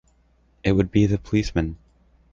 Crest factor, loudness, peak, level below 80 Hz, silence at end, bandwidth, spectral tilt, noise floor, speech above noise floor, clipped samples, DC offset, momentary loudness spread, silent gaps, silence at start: 18 dB; -23 LUFS; -6 dBFS; -38 dBFS; 0.55 s; 7.6 kHz; -7.5 dB/octave; -60 dBFS; 40 dB; under 0.1%; under 0.1%; 10 LU; none; 0.65 s